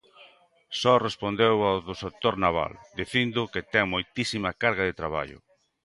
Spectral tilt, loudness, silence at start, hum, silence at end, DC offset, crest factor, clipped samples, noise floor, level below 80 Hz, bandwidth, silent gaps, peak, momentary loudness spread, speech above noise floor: -5 dB/octave; -26 LUFS; 0.2 s; none; 0.45 s; under 0.1%; 20 dB; under 0.1%; -57 dBFS; -52 dBFS; 11.5 kHz; none; -6 dBFS; 11 LU; 31 dB